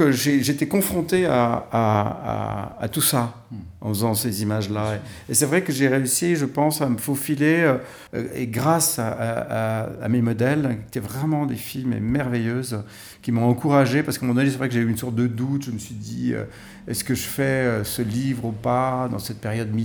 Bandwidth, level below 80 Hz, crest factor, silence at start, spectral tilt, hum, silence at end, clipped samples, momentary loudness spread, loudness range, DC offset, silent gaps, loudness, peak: over 20 kHz; -52 dBFS; 18 dB; 0 s; -5 dB/octave; none; 0 s; under 0.1%; 10 LU; 3 LU; under 0.1%; none; -22 LUFS; -4 dBFS